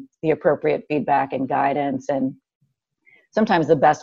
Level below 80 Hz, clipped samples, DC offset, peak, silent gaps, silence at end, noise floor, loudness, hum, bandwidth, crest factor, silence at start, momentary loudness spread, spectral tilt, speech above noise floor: -60 dBFS; under 0.1%; under 0.1%; -4 dBFS; 2.55-2.61 s; 0 s; -62 dBFS; -21 LUFS; none; 7.6 kHz; 16 dB; 0 s; 7 LU; -7 dB/octave; 42 dB